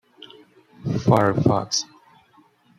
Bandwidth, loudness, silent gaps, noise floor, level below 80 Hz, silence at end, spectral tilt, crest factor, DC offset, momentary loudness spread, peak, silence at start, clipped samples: 13.5 kHz; -21 LUFS; none; -57 dBFS; -52 dBFS; 0.95 s; -5.5 dB/octave; 20 dB; under 0.1%; 14 LU; -4 dBFS; 0.85 s; under 0.1%